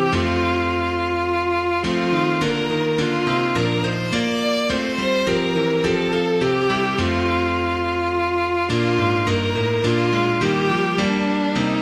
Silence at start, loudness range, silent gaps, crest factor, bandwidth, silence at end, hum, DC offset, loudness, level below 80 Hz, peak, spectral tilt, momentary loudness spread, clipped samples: 0 s; 1 LU; none; 14 dB; 13.5 kHz; 0 s; none; under 0.1%; -20 LUFS; -42 dBFS; -6 dBFS; -5.5 dB/octave; 2 LU; under 0.1%